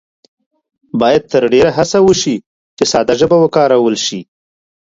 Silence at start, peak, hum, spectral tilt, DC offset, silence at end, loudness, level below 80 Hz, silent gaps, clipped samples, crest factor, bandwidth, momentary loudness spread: 0.95 s; 0 dBFS; none; -4.5 dB/octave; under 0.1%; 0.6 s; -12 LUFS; -46 dBFS; 2.46-2.77 s; under 0.1%; 14 dB; 7.8 kHz; 9 LU